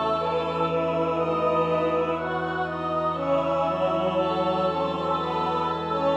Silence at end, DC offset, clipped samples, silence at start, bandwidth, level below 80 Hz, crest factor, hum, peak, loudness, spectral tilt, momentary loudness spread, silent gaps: 0 s; under 0.1%; under 0.1%; 0 s; 8.4 kHz; -52 dBFS; 14 dB; none; -12 dBFS; -25 LUFS; -7 dB/octave; 3 LU; none